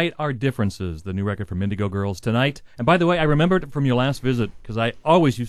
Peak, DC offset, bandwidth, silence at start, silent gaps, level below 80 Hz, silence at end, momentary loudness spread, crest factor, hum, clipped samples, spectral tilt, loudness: -4 dBFS; 0.5%; 13 kHz; 0 s; none; -42 dBFS; 0 s; 9 LU; 16 dB; none; under 0.1%; -7 dB/octave; -22 LUFS